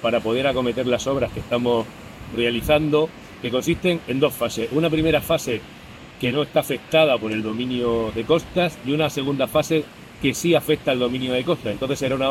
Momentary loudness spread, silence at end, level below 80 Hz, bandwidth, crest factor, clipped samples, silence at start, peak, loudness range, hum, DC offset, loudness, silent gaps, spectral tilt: 7 LU; 0 s; -46 dBFS; 16.5 kHz; 18 dB; under 0.1%; 0 s; -4 dBFS; 1 LU; none; under 0.1%; -22 LUFS; none; -5 dB/octave